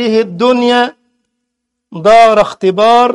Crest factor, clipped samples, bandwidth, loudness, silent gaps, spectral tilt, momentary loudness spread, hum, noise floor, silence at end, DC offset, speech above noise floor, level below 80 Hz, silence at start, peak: 10 dB; under 0.1%; 11 kHz; -9 LUFS; none; -5 dB/octave; 9 LU; none; -73 dBFS; 0 s; under 0.1%; 64 dB; -48 dBFS; 0 s; 0 dBFS